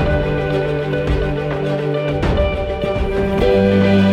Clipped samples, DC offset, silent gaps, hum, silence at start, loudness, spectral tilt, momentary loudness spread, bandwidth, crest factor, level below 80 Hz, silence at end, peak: under 0.1%; under 0.1%; none; none; 0 s; -17 LUFS; -8 dB/octave; 7 LU; 10 kHz; 14 dB; -26 dBFS; 0 s; -2 dBFS